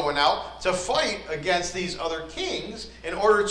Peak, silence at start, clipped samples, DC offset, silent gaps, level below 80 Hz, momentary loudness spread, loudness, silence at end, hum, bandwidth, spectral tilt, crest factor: -10 dBFS; 0 s; under 0.1%; under 0.1%; none; -48 dBFS; 10 LU; -26 LUFS; 0 s; none; 10.5 kHz; -3 dB/octave; 16 dB